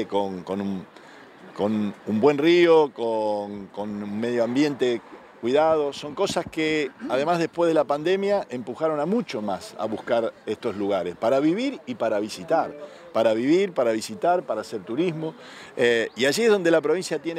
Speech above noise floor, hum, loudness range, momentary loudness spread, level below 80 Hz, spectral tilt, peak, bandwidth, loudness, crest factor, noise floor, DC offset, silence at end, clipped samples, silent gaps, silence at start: 22 dB; none; 3 LU; 11 LU; -66 dBFS; -5 dB/octave; -6 dBFS; 15 kHz; -24 LUFS; 18 dB; -46 dBFS; under 0.1%; 0 s; under 0.1%; none; 0 s